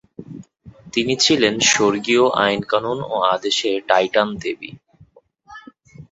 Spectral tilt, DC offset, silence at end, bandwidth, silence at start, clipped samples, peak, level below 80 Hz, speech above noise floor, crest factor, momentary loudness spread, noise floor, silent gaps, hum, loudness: -2.5 dB/octave; under 0.1%; 0.05 s; 8 kHz; 0.2 s; under 0.1%; 0 dBFS; -56 dBFS; 34 dB; 20 dB; 20 LU; -52 dBFS; none; none; -18 LUFS